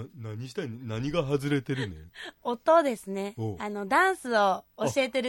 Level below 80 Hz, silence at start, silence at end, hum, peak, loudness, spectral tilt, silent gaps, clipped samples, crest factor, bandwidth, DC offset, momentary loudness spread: -58 dBFS; 0 s; 0 s; none; -10 dBFS; -28 LUFS; -5.5 dB/octave; none; under 0.1%; 18 dB; 16.5 kHz; under 0.1%; 14 LU